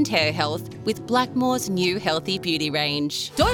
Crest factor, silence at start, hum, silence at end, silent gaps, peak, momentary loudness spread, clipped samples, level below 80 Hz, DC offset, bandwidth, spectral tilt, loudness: 18 dB; 0 s; none; 0 s; none; -4 dBFS; 5 LU; under 0.1%; -44 dBFS; under 0.1%; 20 kHz; -4 dB/octave; -23 LUFS